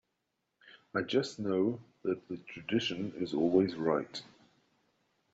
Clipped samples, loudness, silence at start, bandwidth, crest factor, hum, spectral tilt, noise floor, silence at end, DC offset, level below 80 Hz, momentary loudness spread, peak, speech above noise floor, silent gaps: under 0.1%; -33 LUFS; 0.65 s; 8 kHz; 20 dB; none; -4.5 dB/octave; -83 dBFS; 1.1 s; under 0.1%; -72 dBFS; 12 LU; -14 dBFS; 50 dB; none